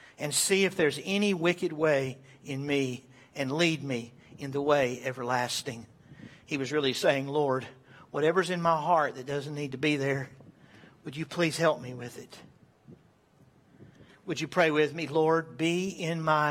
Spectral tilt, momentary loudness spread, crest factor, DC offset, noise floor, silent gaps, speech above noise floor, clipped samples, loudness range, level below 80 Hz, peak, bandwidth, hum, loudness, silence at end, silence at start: -4.5 dB/octave; 17 LU; 20 dB; under 0.1%; -62 dBFS; none; 33 dB; under 0.1%; 6 LU; -70 dBFS; -10 dBFS; 16.5 kHz; none; -29 LUFS; 0 s; 0.2 s